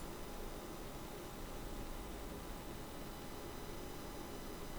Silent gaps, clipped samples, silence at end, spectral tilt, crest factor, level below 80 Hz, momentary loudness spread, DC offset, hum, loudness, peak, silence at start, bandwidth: none; under 0.1%; 0 s; -4.5 dB/octave; 14 dB; -52 dBFS; 1 LU; under 0.1%; none; -49 LUFS; -34 dBFS; 0 s; over 20 kHz